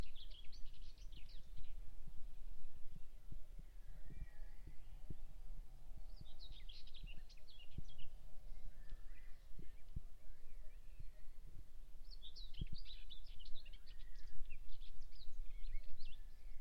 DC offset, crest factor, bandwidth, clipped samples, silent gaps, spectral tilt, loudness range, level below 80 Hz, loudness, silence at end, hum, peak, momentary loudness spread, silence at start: under 0.1%; 14 dB; 5.6 kHz; under 0.1%; none; -5 dB/octave; 4 LU; -50 dBFS; -60 LUFS; 0 s; none; -26 dBFS; 7 LU; 0 s